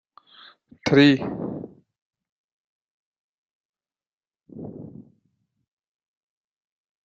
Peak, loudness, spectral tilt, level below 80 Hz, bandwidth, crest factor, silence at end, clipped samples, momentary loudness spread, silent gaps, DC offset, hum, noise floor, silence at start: -4 dBFS; -20 LUFS; -6.5 dB/octave; -64 dBFS; 7.4 kHz; 24 dB; 2.05 s; under 0.1%; 26 LU; 2.02-2.11 s, 2.32-3.12 s, 3.19-3.73 s, 4.13-4.18 s; under 0.1%; none; under -90 dBFS; 0.85 s